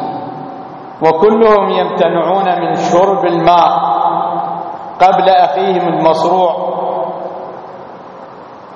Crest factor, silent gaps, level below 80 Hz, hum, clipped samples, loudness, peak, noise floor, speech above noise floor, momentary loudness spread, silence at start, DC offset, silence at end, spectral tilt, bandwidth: 12 dB; none; -50 dBFS; none; 0.1%; -12 LUFS; 0 dBFS; -32 dBFS; 22 dB; 20 LU; 0 s; under 0.1%; 0 s; -6 dB/octave; 7.8 kHz